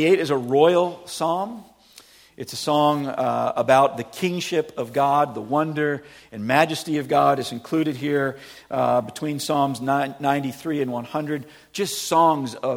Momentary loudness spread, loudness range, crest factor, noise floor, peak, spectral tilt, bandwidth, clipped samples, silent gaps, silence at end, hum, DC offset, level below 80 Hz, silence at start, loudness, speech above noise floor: 11 LU; 3 LU; 20 dB; -50 dBFS; -2 dBFS; -5 dB/octave; 17.5 kHz; under 0.1%; none; 0 s; none; under 0.1%; -64 dBFS; 0 s; -22 LUFS; 29 dB